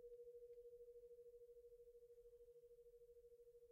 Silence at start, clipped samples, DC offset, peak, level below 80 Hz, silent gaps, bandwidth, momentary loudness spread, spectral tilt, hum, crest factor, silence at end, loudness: 0 s; under 0.1%; under 0.1%; -54 dBFS; -82 dBFS; none; 15 kHz; 6 LU; -5 dB/octave; none; 10 dB; 0 s; -65 LUFS